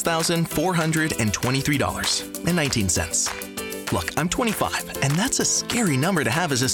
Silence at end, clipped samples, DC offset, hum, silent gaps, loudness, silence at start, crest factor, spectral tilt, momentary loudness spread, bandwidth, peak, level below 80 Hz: 0 s; under 0.1%; under 0.1%; none; none; -22 LUFS; 0 s; 14 dB; -3.5 dB/octave; 5 LU; over 20 kHz; -8 dBFS; -46 dBFS